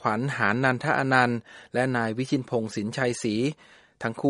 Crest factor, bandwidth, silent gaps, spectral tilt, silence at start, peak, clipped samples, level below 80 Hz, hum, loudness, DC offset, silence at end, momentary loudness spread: 22 dB; 11.5 kHz; none; -5.5 dB/octave; 0 s; -4 dBFS; under 0.1%; -66 dBFS; none; -26 LUFS; under 0.1%; 0 s; 10 LU